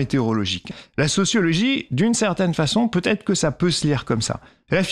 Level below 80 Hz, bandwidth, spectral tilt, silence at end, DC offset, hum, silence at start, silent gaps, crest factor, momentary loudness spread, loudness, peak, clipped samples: -48 dBFS; 12.5 kHz; -4.5 dB/octave; 0 s; under 0.1%; none; 0 s; none; 14 dB; 6 LU; -21 LUFS; -8 dBFS; under 0.1%